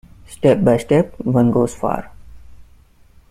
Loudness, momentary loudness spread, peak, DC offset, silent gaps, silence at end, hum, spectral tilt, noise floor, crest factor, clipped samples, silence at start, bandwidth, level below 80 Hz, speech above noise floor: -17 LUFS; 9 LU; -2 dBFS; under 0.1%; none; 0.7 s; none; -7.5 dB/octave; -49 dBFS; 16 dB; under 0.1%; 0.3 s; 14 kHz; -44 dBFS; 33 dB